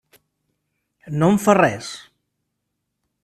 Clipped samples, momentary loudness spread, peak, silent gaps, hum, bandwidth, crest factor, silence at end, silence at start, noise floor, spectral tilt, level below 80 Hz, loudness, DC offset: under 0.1%; 18 LU; 0 dBFS; none; 50 Hz at -45 dBFS; 14 kHz; 22 dB; 1.25 s; 1.05 s; -77 dBFS; -6 dB/octave; -58 dBFS; -18 LUFS; under 0.1%